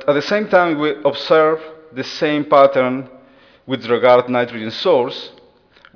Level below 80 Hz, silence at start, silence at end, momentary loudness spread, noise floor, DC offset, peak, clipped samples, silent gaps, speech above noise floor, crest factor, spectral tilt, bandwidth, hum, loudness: -64 dBFS; 0 s; 0.65 s; 14 LU; -50 dBFS; under 0.1%; 0 dBFS; under 0.1%; none; 34 dB; 16 dB; -6 dB/octave; 5.4 kHz; none; -16 LUFS